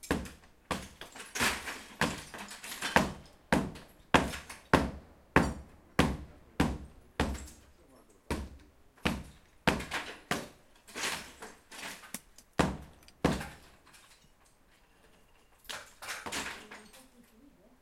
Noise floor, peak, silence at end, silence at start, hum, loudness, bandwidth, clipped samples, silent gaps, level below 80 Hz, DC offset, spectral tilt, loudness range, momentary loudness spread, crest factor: -64 dBFS; -4 dBFS; 0.8 s; 0.05 s; none; -34 LUFS; 16.5 kHz; under 0.1%; none; -48 dBFS; under 0.1%; -4 dB/octave; 12 LU; 19 LU; 32 dB